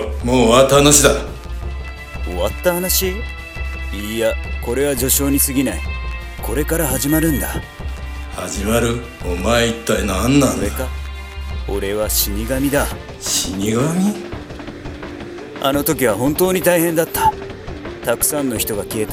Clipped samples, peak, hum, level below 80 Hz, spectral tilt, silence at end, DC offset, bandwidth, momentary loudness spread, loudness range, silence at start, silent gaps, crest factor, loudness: under 0.1%; 0 dBFS; none; -28 dBFS; -4 dB/octave; 0 s; under 0.1%; 17.5 kHz; 15 LU; 4 LU; 0 s; none; 18 dB; -17 LUFS